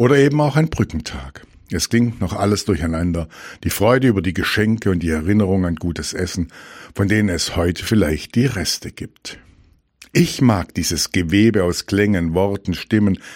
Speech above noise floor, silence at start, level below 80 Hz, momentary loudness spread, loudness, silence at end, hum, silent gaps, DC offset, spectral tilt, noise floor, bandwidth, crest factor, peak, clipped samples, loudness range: 35 dB; 0 s; -36 dBFS; 13 LU; -18 LUFS; 0 s; none; none; under 0.1%; -5.5 dB/octave; -53 dBFS; 17 kHz; 16 dB; -2 dBFS; under 0.1%; 3 LU